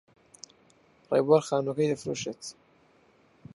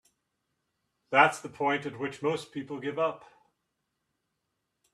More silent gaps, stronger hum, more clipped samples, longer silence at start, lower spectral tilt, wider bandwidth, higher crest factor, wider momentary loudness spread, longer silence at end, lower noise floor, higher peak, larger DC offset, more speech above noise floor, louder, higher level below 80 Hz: neither; neither; neither; about the same, 1.1 s vs 1.1 s; about the same, -5.5 dB/octave vs -4.5 dB/octave; second, 11.5 kHz vs 13 kHz; about the same, 22 dB vs 24 dB; first, 26 LU vs 13 LU; second, 1 s vs 1.75 s; second, -62 dBFS vs -82 dBFS; about the same, -10 dBFS vs -8 dBFS; neither; second, 36 dB vs 53 dB; about the same, -27 LUFS vs -29 LUFS; first, -72 dBFS vs -78 dBFS